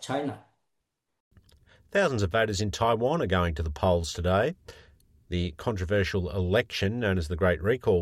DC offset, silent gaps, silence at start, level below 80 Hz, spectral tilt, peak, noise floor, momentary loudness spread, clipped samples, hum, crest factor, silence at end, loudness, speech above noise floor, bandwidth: under 0.1%; 1.20-1.31 s; 0 s; -46 dBFS; -5.5 dB/octave; -12 dBFS; -81 dBFS; 7 LU; under 0.1%; none; 16 dB; 0 s; -27 LUFS; 55 dB; 13.5 kHz